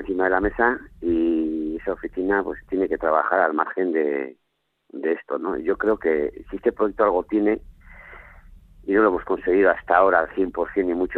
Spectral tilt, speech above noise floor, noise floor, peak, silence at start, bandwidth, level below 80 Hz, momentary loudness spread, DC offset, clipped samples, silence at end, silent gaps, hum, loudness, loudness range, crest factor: -9 dB/octave; 41 dB; -62 dBFS; -4 dBFS; 0 s; 4.3 kHz; -46 dBFS; 9 LU; under 0.1%; under 0.1%; 0 s; none; none; -22 LUFS; 3 LU; 20 dB